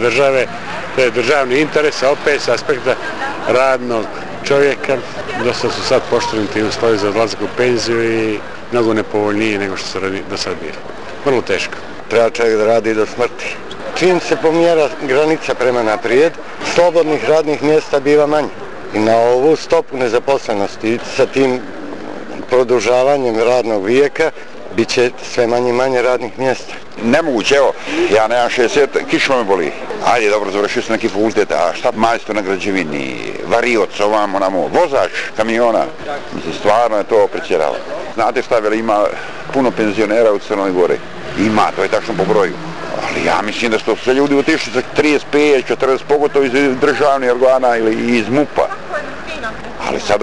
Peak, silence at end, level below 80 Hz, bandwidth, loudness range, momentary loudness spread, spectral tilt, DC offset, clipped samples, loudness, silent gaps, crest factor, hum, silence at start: -4 dBFS; 0 s; -48 dBFS; 11.5 kHz; 3 LU; 10 LU; -4.5 dB/octave; 3%; under 0.1%; -15 LUFS; none; 12 dB; none; 0 s